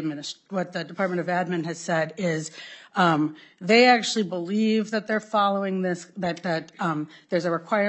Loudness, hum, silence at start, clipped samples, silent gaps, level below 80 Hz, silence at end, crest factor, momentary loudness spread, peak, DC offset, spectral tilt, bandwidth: -25 LUFS; none; 0 s; under 0.1%; none; -76 dBFS; 0 s; 20 dB; 11 LU; -6 dBFS; under 0.1%; -5 dB/octave; 8.6 kHz